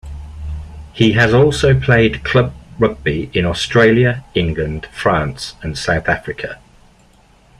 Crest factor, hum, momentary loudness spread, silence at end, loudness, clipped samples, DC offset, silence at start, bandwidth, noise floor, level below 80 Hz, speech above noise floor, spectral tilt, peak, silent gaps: 16 dB; none; 17 LU; 1.05 s; -15 LUFS; under 0.1%; under 0.1%; 0.05 s; 11.5 kHz; -49 dBFS; -34 dBFS; 35 dB; -6 dB/octave; 0 dBFS; none